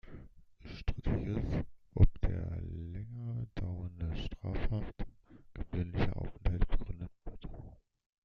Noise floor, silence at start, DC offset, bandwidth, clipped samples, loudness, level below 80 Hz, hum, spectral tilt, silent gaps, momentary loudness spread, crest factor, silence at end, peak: -55 dBFS; 0.05 s; under 0.1%; 5.8 kHz; under 0.1%; -38 LUFS; -38 dBFS; none; -9 dB/octave; none; 16 LU; 22 dB; 0.5 s; -12 dBFS